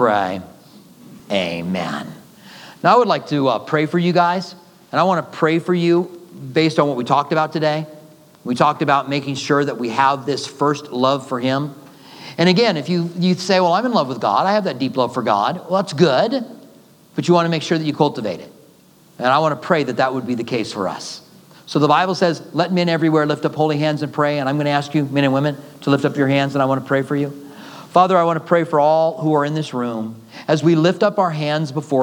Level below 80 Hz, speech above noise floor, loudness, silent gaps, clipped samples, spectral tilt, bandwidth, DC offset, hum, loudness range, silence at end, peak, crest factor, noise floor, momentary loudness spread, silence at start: -70 dBFS; 32 dB; -18 LUFS; none; under 0.1%; -6 dB/octave; 19 kHz; under 0.1%; none; 3 LU; 0 s; 0 dBFS; 18 dB; -49 dBFS; 11 LU; 0 s